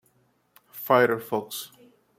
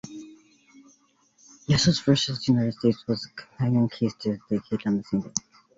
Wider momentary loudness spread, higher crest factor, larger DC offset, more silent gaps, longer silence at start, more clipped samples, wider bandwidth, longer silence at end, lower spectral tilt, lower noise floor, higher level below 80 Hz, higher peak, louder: first, 22 LU vs 11 LU; about the same, 24 dB vs 22 dB; neither; neither; first, 0.75 s vs 0.05 s; neither; first, 16.5 kHz vs 8 kHz; first, 0.55 s vs 0.4 s; about the same, -4.5 dB/octave vs -5.5 dB/octave; about the same, -66 dBFS vs -63 dBFS; second, -76 dBFS vs -54 dBFS; about the same, -4 dBFS vs -4 dBFS; about the same, -24 LUFS vs -25 LUFS